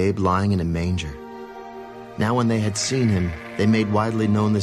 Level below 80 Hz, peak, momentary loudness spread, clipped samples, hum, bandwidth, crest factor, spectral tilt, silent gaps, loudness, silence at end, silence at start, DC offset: -38 dBFS; -6 dBFS; 17 LU; under 0.1%; none; 12.5 kHz; 14 dB; -6 dB/octave; none; -21 LUFS; 0 s; 0 s; under 0.1%